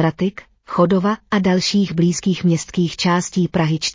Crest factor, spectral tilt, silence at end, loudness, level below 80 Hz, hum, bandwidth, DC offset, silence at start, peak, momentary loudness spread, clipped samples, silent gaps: 14 dB; -5.5 dB/octave; 0 s; -18 LUFS; -50 dBFS; none; 7.6 kHz; under 0.1%; 0 s; -4 dBFS; 5 LU; under 0.1%; none